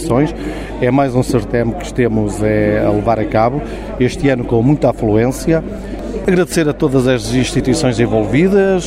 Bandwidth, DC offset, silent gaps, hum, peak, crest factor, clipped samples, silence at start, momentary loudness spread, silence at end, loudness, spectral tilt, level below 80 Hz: 16 kHz; under 0.1%; none; none; 0 dBFS; 14 dB; under 0.1%; 0 s; 6 LU; 0 s; -15 LUFS; -6.5 dB/octave; -30 dBFS